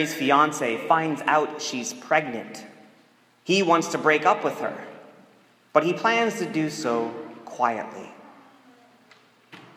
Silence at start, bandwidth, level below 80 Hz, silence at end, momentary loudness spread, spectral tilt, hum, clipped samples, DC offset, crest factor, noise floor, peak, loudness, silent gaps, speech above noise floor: 0 s; 16 kHz; -80 dBFS; 0.1 s; 19 LU; -4 dB/octave; none; under 0.1%; under 0.1%; 22 dB; -59 dBFS; -4 dBFS; -23 LUFS; none; 35 dB